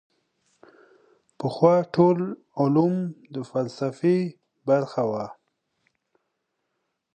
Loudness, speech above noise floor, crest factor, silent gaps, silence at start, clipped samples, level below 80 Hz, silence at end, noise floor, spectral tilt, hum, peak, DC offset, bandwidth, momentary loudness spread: -24 LUFS; 55 dB; 20 dB; none; 1.4 s; under 0.1%; -70 dBFS; 1.85 s; -78 dBFS; -8.5 dB/octave; none; -6 dBFS; under 0.1%; 9.2 kHz; 13 LU